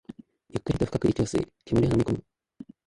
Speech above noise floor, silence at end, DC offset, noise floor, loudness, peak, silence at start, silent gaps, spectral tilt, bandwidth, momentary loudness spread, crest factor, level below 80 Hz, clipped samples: 23 dB; 0.25 s; under 0.1%; -48 dBFS; -27 LUFS; -10 dBFS; 0.55 s; none; -7.5 dB/octave; 11.5 kHz; 11 LU; 18 dB; -46 dBFS; under 0.1%